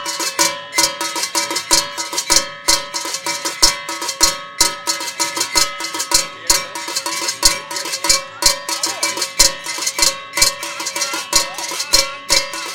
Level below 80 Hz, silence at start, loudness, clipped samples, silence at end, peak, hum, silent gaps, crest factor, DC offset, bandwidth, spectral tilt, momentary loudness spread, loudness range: -38 dBFS; 0 s; -16 LUFS; under 0.1%; 0 s; 0 dBFS; none; none; 18 dB; 1%; over 20 kHz; 1 dB/octave; 7 LU; 1 LU